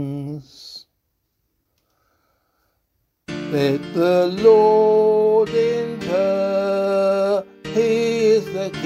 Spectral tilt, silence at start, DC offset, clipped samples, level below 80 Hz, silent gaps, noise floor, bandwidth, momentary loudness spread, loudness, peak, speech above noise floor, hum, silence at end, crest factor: -6.5 dB/octave; 0 s; under 0.1%; under 0.1%; -60 dBFS; none; -72 dBFS; 12.5 kHz; 18 LU; -18 LUFS; -2 dBFS; 56 dB; none; 0 s; 16 dB